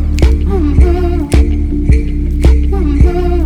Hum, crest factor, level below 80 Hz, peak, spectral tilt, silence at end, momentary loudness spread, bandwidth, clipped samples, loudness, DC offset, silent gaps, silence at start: none; 10 dB; -10 dBFS; 0 dBFS; -8 dB/octave; 0 s; 3 LU; 10.5 kHz; 2%; -12 LUFS; under 0.1%; none; 0 s